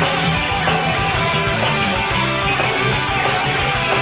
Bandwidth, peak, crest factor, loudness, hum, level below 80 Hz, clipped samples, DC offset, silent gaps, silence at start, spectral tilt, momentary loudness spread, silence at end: 4 kHz; -4 dBFS; 14 dB; -17 LUFS; none; -34 dBFS; under 0.1%; under 0.1%; none; 0 s; -9 dB/octave; 1 LU; 0 s